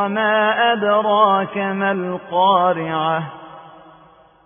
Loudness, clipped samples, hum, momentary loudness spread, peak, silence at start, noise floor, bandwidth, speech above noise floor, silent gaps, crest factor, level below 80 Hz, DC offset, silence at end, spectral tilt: -17 LUFS; under 0.1%; none; 9 LU; -2 dBFS; 0 s; -49 dBFS; 3.7 kHz; 32 dB; none; 16 dB; -64 dBFS; under 0.1%; 0.75 s; -10 dB/octave